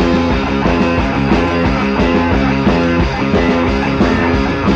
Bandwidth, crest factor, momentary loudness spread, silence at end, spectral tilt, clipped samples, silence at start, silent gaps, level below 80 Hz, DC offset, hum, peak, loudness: 8 kHz; 12 dB; 2 LU; 0 s; -7 dB/octave; under 0.1%; 0 s; none; -24 dBFS; under 0.1%; none; 0 dBFS; -14 LUFS